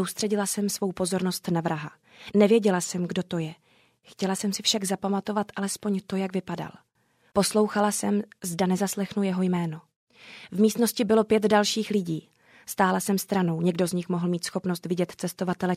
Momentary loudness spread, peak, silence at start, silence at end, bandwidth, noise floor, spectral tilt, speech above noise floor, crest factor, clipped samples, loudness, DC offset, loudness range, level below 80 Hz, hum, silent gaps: 12 LU; -8 dBFS; 0 s; 0 s; 16 kHz; -67 dBFS; -5 dB/octave; 41 dB; 18 dB; under 0.1%; -26 LUFS; under 0.1%; 4 LU; -66 dBFS; none; 9.96-10.07 s